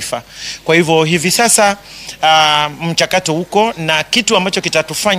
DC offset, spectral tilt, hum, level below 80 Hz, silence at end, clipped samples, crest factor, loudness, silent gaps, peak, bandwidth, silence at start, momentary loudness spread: under 0.1%; -2.5 dB/octave; none; -50 dBFS; 0 s; under 0.1%; 14 dB; -12 LUFS; none; 0 dBFS; over 20 kHz; 0 s; 13 LU